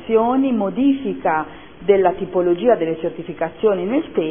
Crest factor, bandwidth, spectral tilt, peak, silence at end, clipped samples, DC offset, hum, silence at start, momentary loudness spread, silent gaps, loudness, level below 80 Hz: 16 dB; 3.6 kHz; -11 dB/octave; -2 dBFS; 0 s; under 0.1%; 0.5%; none; 0 s; 10 LU; none; -19 LUFS; -52 dBFS